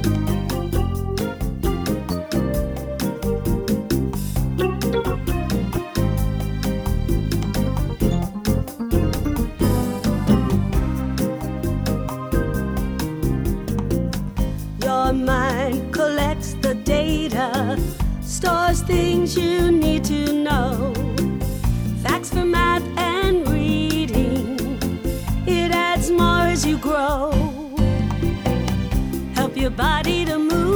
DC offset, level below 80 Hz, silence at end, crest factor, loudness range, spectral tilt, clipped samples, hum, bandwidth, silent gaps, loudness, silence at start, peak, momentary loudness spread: under 0.1%; -28 dBFS; 0 s; 18 dB; 4 LU; -6 dB/octave; under 0.1%; none; over 20 kHz; none; -21 LUFS; 0 s; -2 dBFS; 6 LU